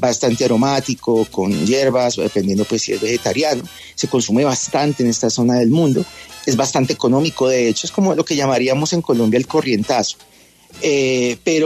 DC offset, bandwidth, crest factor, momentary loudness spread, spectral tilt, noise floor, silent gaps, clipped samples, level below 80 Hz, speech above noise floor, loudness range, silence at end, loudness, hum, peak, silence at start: under 0.1%; 13.5 kHz; 14 dB; 4 LU; -4.5 dB/octave; -43 dBFS; none; under 0.1%; -54 dBFS; 27 dB; 1 LU; 0 s; -17 LUFS; none; -4 dBFS; 0 s